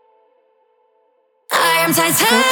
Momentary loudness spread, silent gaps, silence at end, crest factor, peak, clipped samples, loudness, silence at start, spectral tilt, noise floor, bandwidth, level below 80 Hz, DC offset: 5 LU; none; 0 s; 16 dB; -2 dBFS; under 0.1%; -14 LUFS; 1.5 s; -2 dB/octave; -61 dBFS; over 20 kHz; -66 dBFS; under 0.1%